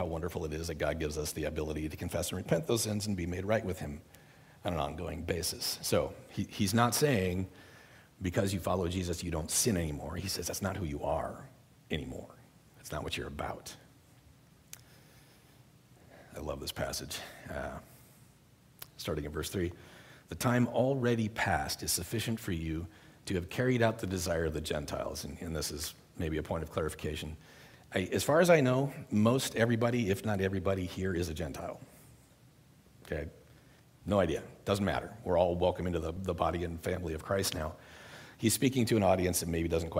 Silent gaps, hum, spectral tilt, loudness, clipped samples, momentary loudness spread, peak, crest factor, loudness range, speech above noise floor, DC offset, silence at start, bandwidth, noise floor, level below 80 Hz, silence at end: none; none; -5 dB/octave; -33 LUFS; under 0.1%; 15 LU; -12 dBFS; 22 dB; 12 LU; 29 dB; under 0.1%; 0 s; 16 kHz; -62 dBFS; -52 dBFS; 0 s